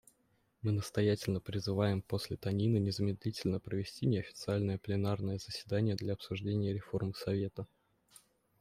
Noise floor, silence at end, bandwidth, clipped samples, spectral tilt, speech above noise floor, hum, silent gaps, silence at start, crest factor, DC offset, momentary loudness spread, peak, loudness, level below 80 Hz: -75 dBFS; 0.95 s; 15 kHz; under 0.1%; -7 dB/octave; 40 dB; none; none; 0.65 s; 18 dB; under 0.1%; 6 LU; -18 dBFS; -36 LUFS; -66 dBFS